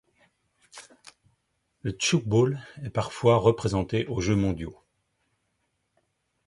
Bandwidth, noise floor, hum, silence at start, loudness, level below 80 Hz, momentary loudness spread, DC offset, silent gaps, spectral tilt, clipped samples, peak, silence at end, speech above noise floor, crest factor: 11.5 kHz; -76 dBFS; none; 0.75 s; -26 LUFS; -50 dBFS; 14 LU; under 0.1%; none; -5.5 dB/octave; under 0.1%; -6 dBFS; 1.75 s; 51 dB; 22 dB